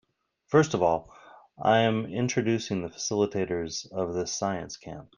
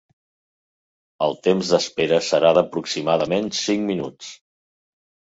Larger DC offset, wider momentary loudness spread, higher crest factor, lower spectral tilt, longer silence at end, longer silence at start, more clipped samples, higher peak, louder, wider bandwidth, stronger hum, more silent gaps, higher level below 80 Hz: neither; about the same, 9 LU vs 10 LU; about the same, 20 dB vs 20 dB; about the same, -5 dB/octave vs -4.5 dB/octave; second, 0.15 s vs 0.95 s; second, 0.5 s vs 1.2 s; neither; second, -8 dBFS vs -2 dBFS; second, -27 LUFS vs -20 LUFS; first, 10.5 kHz vs 8 kHz; neither; neither; about the same, -62 dBFS vs -62 dBFS